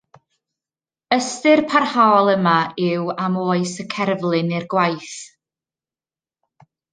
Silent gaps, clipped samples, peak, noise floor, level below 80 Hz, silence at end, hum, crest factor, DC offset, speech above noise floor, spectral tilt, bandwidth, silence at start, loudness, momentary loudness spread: none; under 0.1%; -2 dBFS; under -90 dBFS; -68 dBFS; 1.65 s; none; 18 dB; under 0.1%; over 72 dB; -5 dB/octave; 9.8 kHz; 1.1 s; -18 LUFS; 9 LU